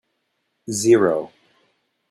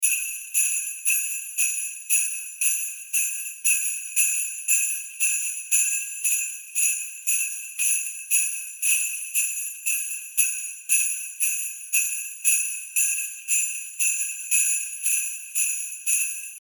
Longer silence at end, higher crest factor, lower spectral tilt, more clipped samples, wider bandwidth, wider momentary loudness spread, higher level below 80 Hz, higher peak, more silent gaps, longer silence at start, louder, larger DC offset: first, 0.85 s vs 0 s; about the same, 18 dB vs 20 dB; first, -5 dB/octave vs 9 dB/octave; neither; second, 14.5 kHz vs 19.5 kHz; first, 23 LU vs 5 LU; first, -64 dBFS vs -82 dBFS; about the same, -4 dBFS vs -6 dBFS; neither; first, 0.7 s vs 0 s; first, -19 LUFS vs -22 LUFS; neither